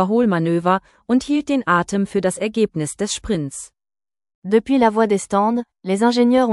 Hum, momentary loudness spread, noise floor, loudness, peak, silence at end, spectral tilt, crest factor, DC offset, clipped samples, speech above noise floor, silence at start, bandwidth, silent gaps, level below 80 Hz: none; 8 LU; under -90 dBFS; -19 LUFS; -2 dBFS; 0 s; -5.5 dB/octave; 16 dB; under 0.1%; under 0.1%; over 72 dB; 0 s; 12 kHz; 4.35-4.42 s; -50 dBFS